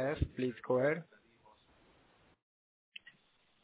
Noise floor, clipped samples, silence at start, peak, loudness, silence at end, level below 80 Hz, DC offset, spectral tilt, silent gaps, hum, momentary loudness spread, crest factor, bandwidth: -72 dBFS; under 0.1%; 0 s; -20 dBFS; -35 LUFS; 2.6 s; -52 dBFS; under 0.1%; -6 dB/octave; none; none; 21 LU; 20 dB; 4 kHz